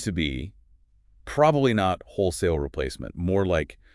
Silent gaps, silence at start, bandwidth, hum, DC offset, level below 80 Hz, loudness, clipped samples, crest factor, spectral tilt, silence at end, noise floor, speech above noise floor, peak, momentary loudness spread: none; 0 s; 12 kHz; none; under 0.1%; -42 dBFS; -25 LUFS; under 0.1%; 18 dB; -6 dB/octave; 0.2 s; -58 dBFS; 34 dB; -6 dBFS; 12 LU